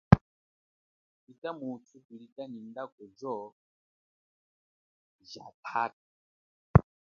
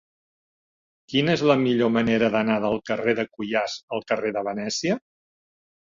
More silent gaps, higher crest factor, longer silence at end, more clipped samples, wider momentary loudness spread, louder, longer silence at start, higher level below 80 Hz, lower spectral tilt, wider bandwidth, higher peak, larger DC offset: first, 0.21-1.27 s, 1.38-1.42 s, 2.05-2.09 s, 2.32-2.36 s, 2.92-2.98 s, 3.52-5.19 s, 5.54-5.63 s, 5.93-6.74 s vs 3.83-3.88 s; first, 30 dB vs 20 dB; second, 0.4 s vs 0.9 s; neither; first, 23 LU vs 7 LU; second, -31 LUFS vs -23 LUFS; second, 0.1 s vs 1.1 s; first, -46 dBFS vs -60 dBFS; first, -8 dB/octave vs -5 dB/octave; second, 6.8 kHz vs 7.6 kHz; about the same, -2 dBFS vs -4 dBFS; neither